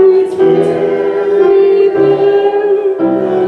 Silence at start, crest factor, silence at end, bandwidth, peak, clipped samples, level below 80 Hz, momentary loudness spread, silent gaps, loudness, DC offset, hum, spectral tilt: 0 s; 8 dB; 0 s; 4.7 kHz; -2 dBFS; under 0.1%; -56 dBFS; 5 LU; none; -10 LUFS; under 0.1%; none; -8 dB/octave